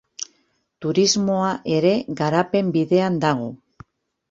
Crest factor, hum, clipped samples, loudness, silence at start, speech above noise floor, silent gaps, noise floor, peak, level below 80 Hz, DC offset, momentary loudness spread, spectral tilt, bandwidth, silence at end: 18 dB; none; under 0.1%; -20 LUFS; 0.2 s; 47 dB; none; -66 dBFS; -4 dBFS; -60 dBFS; under 0.1%; 15 LU; -5 dB/octave; 7.8 kHz; 0.75 s